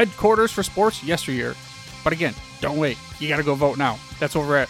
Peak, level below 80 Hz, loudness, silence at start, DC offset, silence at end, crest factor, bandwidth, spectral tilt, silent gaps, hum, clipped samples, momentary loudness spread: -4 dBFS; -46 dBFS; -22 LUFS; 0 s; under 0.1%; 0 s; 18 dB; 16.5 kHz; -5 dB/octave; none; none; under 0.1%; 10 LU